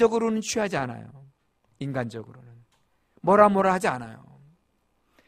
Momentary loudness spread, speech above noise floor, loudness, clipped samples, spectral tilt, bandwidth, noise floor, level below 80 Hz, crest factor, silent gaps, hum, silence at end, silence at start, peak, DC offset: 20 LU; 46 dB; -24 LUFS; under 0.1%; -5.5 dB/octave; 15.5 kHz; -70 dBFS; -60 dBFS; 24 dB; none; none; 1.15 s; 0 s; -2 dBFS; under 0.1%